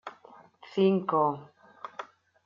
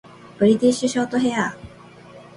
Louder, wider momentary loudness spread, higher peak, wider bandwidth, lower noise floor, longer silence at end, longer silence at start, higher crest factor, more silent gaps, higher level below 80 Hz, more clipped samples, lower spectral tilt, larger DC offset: second, -27 LUFS vs -20 LUFS; first, 21 LU vs 10 LU; second, -12 dBFS vs -6 dBFS; second, 7 kHz vs 11.5 kHz; first, -55 dBFS vs -44 dBFS; first, 0.4 s vs 0.15 s; second, 0.05 s vs 0.25 s; about the same, 18 dB vs 16 dB; neither; second, -80 dBFS vs -56 dBFS; neither; first, -8.5 dB/octave vs -5 dB/octave; neither